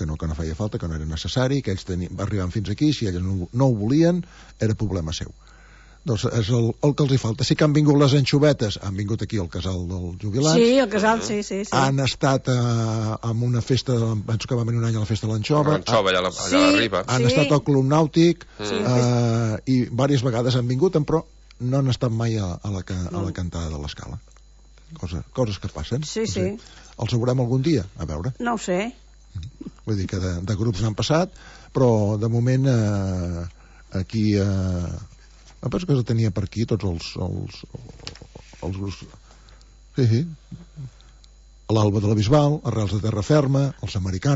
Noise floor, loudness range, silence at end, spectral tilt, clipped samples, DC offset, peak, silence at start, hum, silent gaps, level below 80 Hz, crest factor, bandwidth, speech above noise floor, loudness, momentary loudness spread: -49 dBFS; 9 LU; 0 s; -6 dB/octave; under 0.1%; under 0.1%; -4 dBFS; 0 s; none; none; -42 dBFS; 18 dB; 8 kHz; 28 dB; -22 LUFS; 14 LU